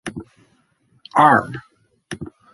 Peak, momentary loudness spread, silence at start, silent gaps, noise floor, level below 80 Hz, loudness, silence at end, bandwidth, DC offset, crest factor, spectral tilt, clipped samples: -2 dBFS; 23 LU; 0.05 s; none; -61 dBFS; -54 dBFS; -15 LUFS; 0.25 s; 11.5 kHz; under 0.1%; 20 dB; -5.5 dB/octave; under 0.1%